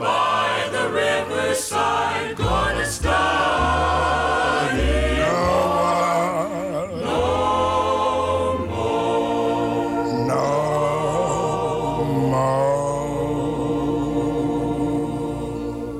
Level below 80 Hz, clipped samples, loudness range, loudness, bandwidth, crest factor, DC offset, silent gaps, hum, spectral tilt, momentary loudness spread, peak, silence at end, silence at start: -34 dBFS; under 0.1%; 2 LU; -21 LUFS; 16 kHz; 14 dB; under 0.1%; none; none; -5 dB/octave; 5 LU; -8 dBFS; 0 s; 0 s